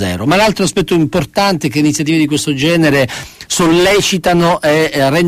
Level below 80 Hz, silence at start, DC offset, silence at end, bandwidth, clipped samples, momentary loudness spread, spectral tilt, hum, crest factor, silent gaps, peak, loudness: -38 dBFS; 0 s; under 0.1%; 0 s; 15.5 kHz; under 0.1%; 4 LU; -4.5 dB/octave; none; 12 dB; none; -2 dBFS; -12 LUFS